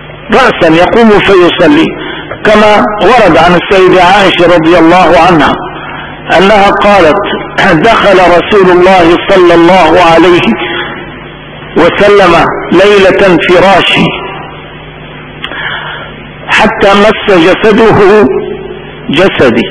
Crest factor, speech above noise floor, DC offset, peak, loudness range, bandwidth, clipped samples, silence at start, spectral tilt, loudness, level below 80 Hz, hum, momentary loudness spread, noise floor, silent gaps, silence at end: 6 dB; 21 dB; 3%; 0 dBFS; 4 LU; 11 kHz; 10%; 0 s; -5.5 dB/octave; -4 LUFS; -30 dBFS; none; 17 LU; -24 dBFS; none; 0 s